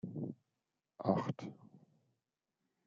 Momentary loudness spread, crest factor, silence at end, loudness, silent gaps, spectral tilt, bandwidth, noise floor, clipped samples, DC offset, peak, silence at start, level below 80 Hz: 20 LU; 26 dB; 1.1 s; -40 LUFS; none; -8.5 dB/octave; 7.4 kHz; -89 dBFS; under 0.1%; under 0.1%; -18 dBFS; 0.05 s; -82 dBFS